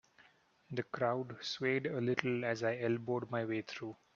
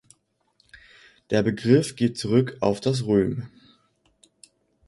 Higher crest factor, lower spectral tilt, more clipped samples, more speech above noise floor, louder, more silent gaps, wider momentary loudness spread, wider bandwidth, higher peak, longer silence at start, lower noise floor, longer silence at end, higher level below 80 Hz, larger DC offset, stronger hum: first, 26 dB vs 20 dB; about the same, -6 dB/octave vs -6.5 dB/octave; neither; second, 31 dB vs 45 dB; second, -37 LUFS vs -23 LUFS; neither; about the same, 8 LU vs 7 LU; second, 7.4 kHz vs 11.5 kHz; second, -12 dBFS vs -4 dBFS; about the same, 0.7 s vs 0.75 s; about the same, -68 dBFS vs -67 dBFS; second, 0.2 s vs 1.4 s; second, -78 dBFS vs -56 dBFS; neither; neither